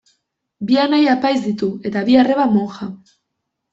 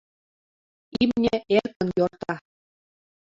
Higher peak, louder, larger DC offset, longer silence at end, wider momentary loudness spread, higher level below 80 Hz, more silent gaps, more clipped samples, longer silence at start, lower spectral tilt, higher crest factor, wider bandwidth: first, -2 dBFS vs -6 dBFS; first, -16 LUFS vs -24 LUFS; neither; about the same, 0.75 s vs 0.85 s; first, 15 LU vs 12 LU; about the same, -60 dBFS vs -56 dBFS; second, none vs 1.76-1.80 s; neither; second, 0.6 s vs 0.95 s; about the same, -6.5 dB/octave vs -7 dB/octave; about the same, 16 dB vs 20 dB; about the same, 7.6 kHz vs 7.6 kHz